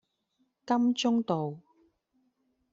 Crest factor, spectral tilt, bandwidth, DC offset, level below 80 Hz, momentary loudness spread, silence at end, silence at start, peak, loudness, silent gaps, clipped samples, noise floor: 18 dB; -5 dB/octave; 7.6 kHz; under 0.1%; -76 dBFS; 11 LU; 1.15 s; 0.65 s; -14 dBFS; -29 LUFS; none; under 0.1%; -76 dBFS